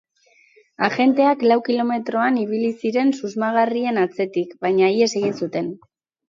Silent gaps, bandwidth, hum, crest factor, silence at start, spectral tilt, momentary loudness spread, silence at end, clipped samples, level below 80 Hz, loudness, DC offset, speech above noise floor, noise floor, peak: none; 7.6 kHz; none; 18 dB; 0.8 s; -5.5 dB/octave; 8 LU; 0.55 s; under 0.1%; -72 dBFS; -20 LUFS; under 0.1%; 38 dB; -57 dBFS; -2 dBFS